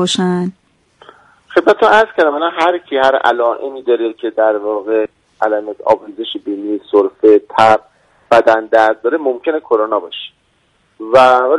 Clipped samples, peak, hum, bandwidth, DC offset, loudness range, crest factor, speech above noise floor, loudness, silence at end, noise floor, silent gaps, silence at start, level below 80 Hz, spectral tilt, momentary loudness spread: 0.1%; 0 dBFS; none; 11 kHz; under 0.1%; 4 LU; 14 dB; 45 dB; -13 LUFS; 0 s; -58 dBFS; none; 0 s; -56 dBFS; -5 dB/octave; 11 LU